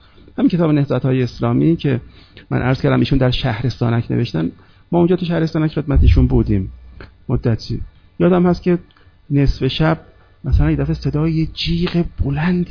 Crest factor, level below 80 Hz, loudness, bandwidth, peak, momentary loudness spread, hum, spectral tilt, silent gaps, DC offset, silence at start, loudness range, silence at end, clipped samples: 16 dB; -26 dBFS; -17 LUFS; 5.4 kHz; 0 dBFS; 9 LU; none; -8.5 dB/octave; none; under 0.1%; 0.4 s; 2 LU; 0.05 s; under 0.1%